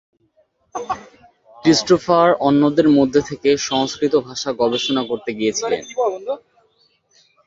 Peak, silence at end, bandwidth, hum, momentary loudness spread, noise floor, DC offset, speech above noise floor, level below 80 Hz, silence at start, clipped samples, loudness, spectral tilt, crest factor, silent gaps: -2 dBFS; 1.1 s; 7.8 kHz; none; 14 LU; -61 dBFS; under 0.1%; 44 dB; -56 dBFS; 0.75 s; under 0.1%; -18 LUFS; -4.5 dB/octave; 18 dB; none